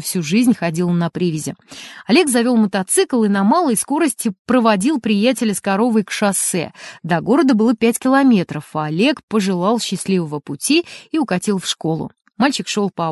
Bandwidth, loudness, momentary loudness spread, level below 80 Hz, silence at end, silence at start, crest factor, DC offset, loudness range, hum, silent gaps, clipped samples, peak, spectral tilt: 12 kHz; -17 LUFS; 9 LU; -60 dBFS; 0 s; 0 s; 16 dB; under 0.1%; 3 LU; none; 4.39-4.45 s, 9.23-9.28 s; under 0.1%; -2 dBFS; -4.5 dB/octave